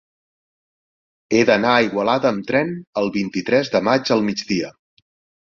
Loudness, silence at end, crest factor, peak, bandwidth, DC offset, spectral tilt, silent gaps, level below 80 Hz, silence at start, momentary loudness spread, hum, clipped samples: -19 LUFS; 0.7 s; 18 dB; -2 dBFS; 7.6 kHz; under 0.1%; -5 dB/octave; 2.87-2.93 s; -58 dBFS; 1.3 s; 8 LU; none; under 0.1%